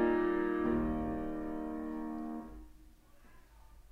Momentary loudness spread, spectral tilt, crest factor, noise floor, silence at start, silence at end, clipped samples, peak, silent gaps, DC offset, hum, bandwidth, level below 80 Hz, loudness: 13 LU; -8.5 dB/octave; 16 dB; -59 dBFS; 0 s; 0.05 s; under 0.1%; -20 dBFS; none; under 0.1%; none; 5.8 kHz; -50 dBFS; -36 LUFS